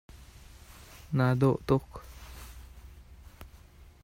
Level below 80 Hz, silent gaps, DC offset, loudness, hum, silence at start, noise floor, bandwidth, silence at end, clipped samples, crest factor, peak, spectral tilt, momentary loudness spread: -50 dBFS; none; under 0.1%; -28 LUFS; none; 0.1 s; -53 dBFS; 16 kHz; 0.6 s; under 0.1%; 20 dB; -12 dBFS; -8 dB/octave; 27 LU